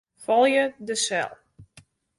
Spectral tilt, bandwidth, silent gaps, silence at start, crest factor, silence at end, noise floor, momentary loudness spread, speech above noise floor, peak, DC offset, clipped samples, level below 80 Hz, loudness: -2 dB/octave; 11.5 kHz; none; 0.2 s; 16 dB; 0.55 s; -56 dBFS; 9 LU; 33 dB; -8 dBFS; under 0.1%; under 0.1%; -68 dBFS; -23 LUFS